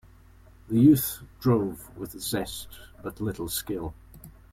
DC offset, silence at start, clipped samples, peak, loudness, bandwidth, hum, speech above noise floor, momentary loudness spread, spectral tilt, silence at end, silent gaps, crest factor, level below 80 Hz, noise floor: under 0.1%; 0.65 s; under 0.1%; -8 dBFS; -26 LUFS; 16.5 kHz; none; 27 dB; 20 LU; -6 dB/octave; 0.2 s; none; 20 dB; -50 dBFS; -53 dBFS